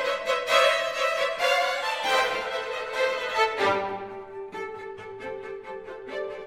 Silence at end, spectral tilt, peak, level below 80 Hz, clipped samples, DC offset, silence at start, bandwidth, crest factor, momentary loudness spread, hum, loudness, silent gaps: 0 s; -1.5 dB/octave; -6 dBFS; -64 dBFS; under 0.1%; under 0.1%; 0 s; 16 kHz; 20 dB; 16 LU; none; -25 LUFS; none